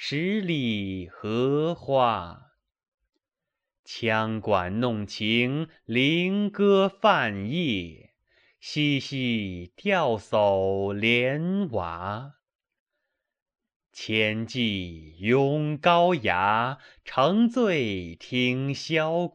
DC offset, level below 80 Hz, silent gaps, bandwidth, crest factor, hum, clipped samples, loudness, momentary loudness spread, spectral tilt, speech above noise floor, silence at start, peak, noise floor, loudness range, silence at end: under 0.1%; -62 dBFS; 2.88-2.98 s, 3.79-3.83 s, 12.55-12.59 s, 12.80-12.86 s, 13.42-13.46 s, 13.76-13.80 s; 15.5 kHz; 20 dB; none; under 0.1%; -25 LUFS; 11 LU; -6 dB/octave; 62 dB; 0 s; -6 dBFS; -87 dBFS; 5 LU; 0.05 s